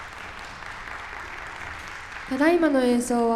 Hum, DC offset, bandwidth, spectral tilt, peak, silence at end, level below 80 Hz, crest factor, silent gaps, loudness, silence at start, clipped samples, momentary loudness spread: none; under 0.1%; 14 kHz; -4.5 dB/octave; -8 dBFS; 0 s; -50 dBFS; 18 dB; none; -25 LUFS; 0 s; under 0.1%; 17 LU